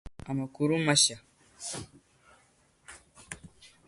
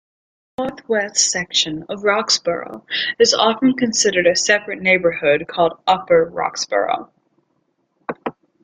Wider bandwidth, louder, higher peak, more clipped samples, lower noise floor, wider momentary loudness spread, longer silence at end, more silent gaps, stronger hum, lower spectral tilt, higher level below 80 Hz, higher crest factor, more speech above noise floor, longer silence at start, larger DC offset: first, 11.5 kHz vs 10 kHz; second, -28 LUFS vs -17 LUFS; second, -10 dBFS vs -2 dBFS; neither; about the same, -66 dBFS vs -67 dBFS; first, 28 LU vs 12 LU; about the same, 0.2 s vs 0.3 s; neither; neither; about the same, -3 dB/octave vs -2 dB/octave; about the same, -58 dBFS vs -58 dBFS; first, 24 dB vs 18 dB; second, 37 dB vs 49 dB; second, 0.05 s vs 0.6 s; neither